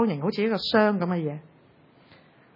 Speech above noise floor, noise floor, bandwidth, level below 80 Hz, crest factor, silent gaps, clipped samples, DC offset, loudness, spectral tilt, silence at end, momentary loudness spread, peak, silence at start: 32 dB; -57 dBFS; 5.8 kHz; -68 dBFS; 20 dB; none; under 0.1%; under 0.1%; -25 LUFS; -7.5 dB/octave; 1.15 s; 11 LU; -6 dBFS; 0 s